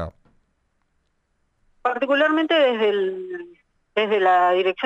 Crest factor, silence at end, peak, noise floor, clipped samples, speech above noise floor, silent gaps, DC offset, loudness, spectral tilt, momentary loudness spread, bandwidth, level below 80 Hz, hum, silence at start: 14 dB; 0 s; -8 dBFS; -69 dBFS; under 0.1%; 50 dB; none; under 0.1%; -20 LUFS; -5.5 dB/octave; 15 LU; 8 kHz; -56 dBFS; none; 0 s